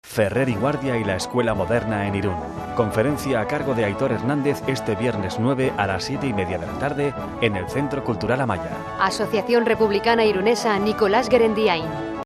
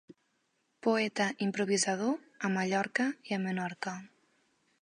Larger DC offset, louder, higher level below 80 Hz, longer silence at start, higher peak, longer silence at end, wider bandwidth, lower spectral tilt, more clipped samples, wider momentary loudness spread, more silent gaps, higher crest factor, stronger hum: neither; first, -22 LUFS vs -32 LUFS; first, -46 dBFS vs -82 dBFS; about the same, 0.05 s vs 0.1 s; first, -2 dBFS vs -14 dBFS; second, 0 s vs 0.75 s; first, 14 kHz vs 11 kHz; first, -6 dB/octave vs -4 dB/octave; neither; about the same, 7 LU vs 7 LU; neither; about the same, 18 dB vs 18 dB; neither